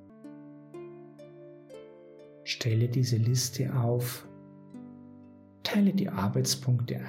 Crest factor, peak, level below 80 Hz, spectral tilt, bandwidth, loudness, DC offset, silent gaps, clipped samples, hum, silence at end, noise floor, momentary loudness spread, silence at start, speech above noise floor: 16 dB; -14 dBFS; -72 dBFS; -5.5 dB/octave; 16 kHz; -29 LUFS; under 0.1%; none; under 0.1%; none; 0 s; -53 dBFS; 23 LU; 0.1 s; 25 dB